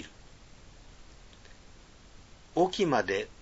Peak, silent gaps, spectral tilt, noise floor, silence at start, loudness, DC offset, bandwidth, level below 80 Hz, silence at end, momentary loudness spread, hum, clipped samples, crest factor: -12 dBFS; none; -5 dB/octave; -53 dBFS; 0 s; -29 LUFS; under 0.1%; 8 kHz; -56 dBFS; 0.1 s; 27 LU; none; under 0.1%; 22 dB